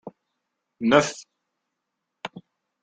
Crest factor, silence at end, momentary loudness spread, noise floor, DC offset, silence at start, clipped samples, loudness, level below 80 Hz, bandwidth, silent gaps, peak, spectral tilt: 26 dB; 0.45 s; 20 LU; -81 dBFS; under 0.1%; 0.05 s; under 0.1%; -22 LUFS; -66 dBFS; 9.4 kHz; none; -2 dBFS; -4.5 dB/octave